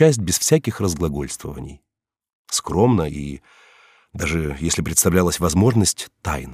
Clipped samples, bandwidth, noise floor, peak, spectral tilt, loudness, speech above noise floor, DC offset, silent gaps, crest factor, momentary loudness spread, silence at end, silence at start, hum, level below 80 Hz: under 0.1%; 16 kHz; -53 dBFS; -2 dBFS; -4.5 dB/octave; -20 LUFS; 33 dB; under 0.1%; 2.33-2.45 s; 18 dB; 16 LU; 0 s; 0 s; none; -38 dBFS